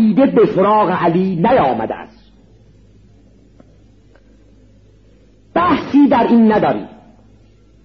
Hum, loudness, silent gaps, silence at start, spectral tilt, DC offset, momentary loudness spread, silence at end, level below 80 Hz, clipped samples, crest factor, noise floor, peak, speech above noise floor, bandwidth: none; -13 LUFS; none; 0 s; -6 dB/octave; 0.1%; 12 LU; 0.95 s; -48 dBFS; under 0.1%; 14 dB; -48 dBFS; -2 dBFS; 35 dB; 6 kHz